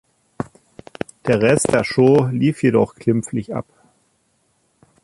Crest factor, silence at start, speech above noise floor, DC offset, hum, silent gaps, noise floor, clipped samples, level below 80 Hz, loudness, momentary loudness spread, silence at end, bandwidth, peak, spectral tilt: 18 dB; 0.4 s; 48 dB; under 0.1%; none; none; -64 dBFS; under 0.1%; -52 dBFS; -18 LUFS; 18 LU; 1.4 s; 11.5 kHz; -2 dBFS; -6 dB/octave